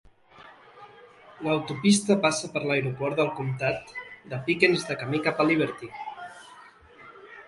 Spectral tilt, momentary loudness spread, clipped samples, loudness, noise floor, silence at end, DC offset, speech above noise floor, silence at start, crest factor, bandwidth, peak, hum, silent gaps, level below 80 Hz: -4.5 dB/octave; 17 LU; under 0.1%; -25 LUFS; -52 dBFS; 0.05 s; under 0.1%; 26 dB; 0.4 s; 22 dB; 11.5 kHz; -6 dBFS; none; none; -64 dBFS